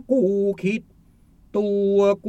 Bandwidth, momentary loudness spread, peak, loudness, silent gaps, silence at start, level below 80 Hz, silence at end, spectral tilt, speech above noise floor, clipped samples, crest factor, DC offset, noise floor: 8.4 kHz; 9 LU; -8 dBFS; -22 LUFS; none; 0.1 s; -56 dBFS; 0 s; -7.5 dB/octave; 34 dB; under 0.1%; 14 dB; under 0.1%; -54 dBFS